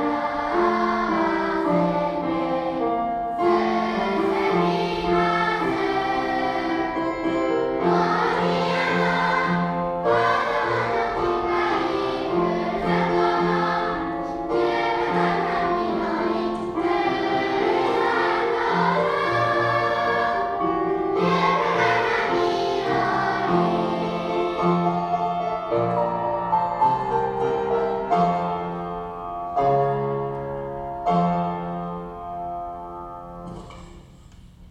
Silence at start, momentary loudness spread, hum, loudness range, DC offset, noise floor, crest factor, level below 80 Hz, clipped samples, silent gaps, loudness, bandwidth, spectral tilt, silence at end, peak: 0 s; 8 LU; none; 4 LU; under 0.1%; -46 dBFS; 14 dB; -48 dBFS; under 0.1%; none; -23 LUFS; 10 kHz; -6.5 dB/octave; 0.05 s; -8 dBFS